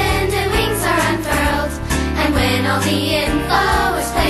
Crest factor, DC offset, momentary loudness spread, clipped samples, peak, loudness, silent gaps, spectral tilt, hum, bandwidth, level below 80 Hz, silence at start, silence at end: 14 dB; under 0.1%; 3 LU; under 0.1%; -2 dBFS; -17 LUFS; none; -4.5 dB/octave; none; 13 kHz; -26 dBFS; 0 s; 0 s